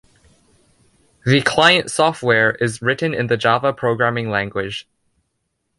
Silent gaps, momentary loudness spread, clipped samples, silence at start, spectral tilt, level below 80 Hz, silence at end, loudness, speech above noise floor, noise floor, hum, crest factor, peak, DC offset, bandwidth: none; 11 LU; under 0.1%; 1.25 s; -4.5 dB/octave; -54 dBFS; 1 s; -17 LUFS; 55 dB; -72 dBFS; none; 18 dB; 0 dBFS; under 0.1%; 11.5 kHz